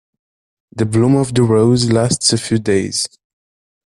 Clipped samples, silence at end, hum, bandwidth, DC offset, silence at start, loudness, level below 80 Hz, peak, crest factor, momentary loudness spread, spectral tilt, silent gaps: under 0.1%; 0.85 s; none; 12.5 kHz; under 0.1%; 0.75 s; -15 LUFS; -48 dBFS; 0 dBFS; 16 dB; 9 LU; -5 dB/octave; none